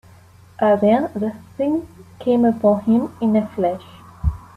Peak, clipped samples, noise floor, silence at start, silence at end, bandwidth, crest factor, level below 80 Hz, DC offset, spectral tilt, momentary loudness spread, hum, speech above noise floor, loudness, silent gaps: -4 dBFS; under 0.1%; -47 dBFS; 0.6 s; 0.15 s; 12 kHz; 14 dB; -36 dBFS; under 0.1%; -9 dB/octave; 10 LU; none; 28 dB; -19 LUFS; none